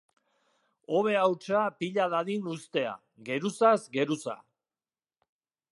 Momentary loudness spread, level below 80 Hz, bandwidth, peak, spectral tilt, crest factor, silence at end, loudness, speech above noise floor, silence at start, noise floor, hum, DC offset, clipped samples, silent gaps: 11 LU; -82 dBFS; 11.5 kHz; -10 dBFS; -5.5 dB/octave; 22 dB; 1.4 s; -29 LUFS; over 62 dB; 0.9 s; under -90 dBFS; none; under 0.1%; under 0.1%; none